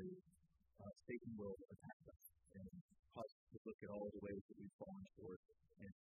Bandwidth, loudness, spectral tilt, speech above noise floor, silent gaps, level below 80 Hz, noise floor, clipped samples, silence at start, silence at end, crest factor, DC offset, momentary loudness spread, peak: 2.7 kHz; -57 LUFS; -5.5 dB/octave; 24 dB; 1.93-2.00 s, 2.81-2.89 s, 3.32-3.47 s, 3.58-3.65 s, 3.74-3.79 s, 4.41-4.49 s, 4.73-4.79 s, 5.36-5.43 s; -78 dBFS; -79 dBFS; under 0.1%; 0 s; 0.15 s; 18 dB; under 0.1%; 12 LU; -38 dBFS